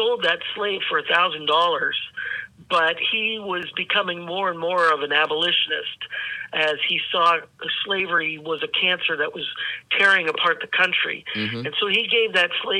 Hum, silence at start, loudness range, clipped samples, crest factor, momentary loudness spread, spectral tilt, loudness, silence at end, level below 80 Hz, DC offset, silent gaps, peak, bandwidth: none; 0 s; 2 LU; under 0.1%; 20 dB; 9 LU; -3.5 dB/octave; -21 LUFS; 0 s; -70 dBFS; under 0.1%; none; -4 dBFS; 10.5 kHz